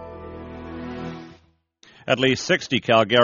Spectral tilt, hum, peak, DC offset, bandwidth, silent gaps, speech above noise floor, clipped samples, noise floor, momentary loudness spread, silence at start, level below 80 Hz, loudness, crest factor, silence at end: -2.5 dB/octave; none; -2 dBFS; under 0.1%; 7.2 kHz; none; 39 dB; under 0.1%; -58 dBFS; 19 LU; 0 s; -52 dBFS; -21 LUFS; 22 dB; 0 s